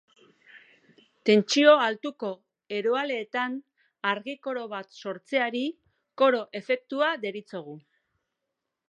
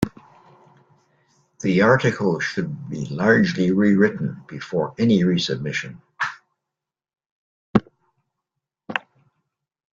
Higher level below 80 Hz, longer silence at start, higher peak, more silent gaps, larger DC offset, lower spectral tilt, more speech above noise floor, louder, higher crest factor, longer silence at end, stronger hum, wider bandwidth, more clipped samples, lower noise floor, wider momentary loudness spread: second, -84 dBFS vs -56 dBFS; first, 0.55 s vs 0 s; second, -6 dBFS vs -2 dBFS; second, none vs 7.26-7.74 s; neither; second, -4 dB/octave vs -6.5 dB/octave; second, 58 dB vs 66 dB; second, -26 LUFS vs -21 LUFS; about the same, 22 dB vs 22 dB; first, 1.1 s vs 0.95 s; neither; first, 9 kHz vs 7.8 kHz; neither; about the same, -84 dBFS vs -86 dBFS; first, 18 LU vs 13 LU